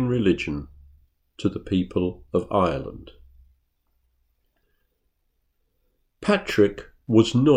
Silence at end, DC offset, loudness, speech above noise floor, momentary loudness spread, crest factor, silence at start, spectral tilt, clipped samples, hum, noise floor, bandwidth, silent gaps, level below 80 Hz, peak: 0 s; under 0.1%; -23 LUFS; 50 dB; 13 LU; 22 dB; 0 s; -7 dB/octave; under 0.1%; none; -72 dBFS; 14.5 kHz; none; -50 dBFS; -4 dBFS